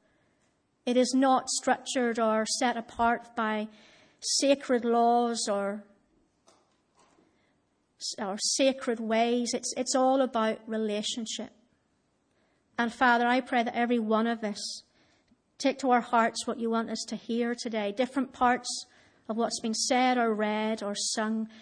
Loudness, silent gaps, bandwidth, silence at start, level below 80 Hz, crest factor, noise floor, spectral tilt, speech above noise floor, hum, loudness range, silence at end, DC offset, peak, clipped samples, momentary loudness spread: -28 LUFS; none; 10.5 kHz; 0.85 s; -68 dBFS; 18 dB; -73 dBFS; -2.5 dB/octave; 45 dB; none; 3 LU; 0 s; under 0.1%; -12 dBFS; under 0.1%; 11 LU